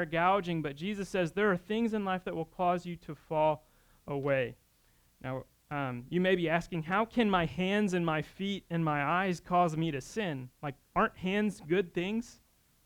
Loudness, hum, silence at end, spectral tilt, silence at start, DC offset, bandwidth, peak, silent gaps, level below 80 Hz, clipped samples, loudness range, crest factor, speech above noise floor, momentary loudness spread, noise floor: -32 LUFS; none; 0.55 s; -6.5 dB/octave; 0 s; under 0.1%; 18.5 kHz; -14 dBFS; none; -60 dBFS; under 0.1%; 4 LU; 18 dB; 36 dB; 11 LU; -67 dBFS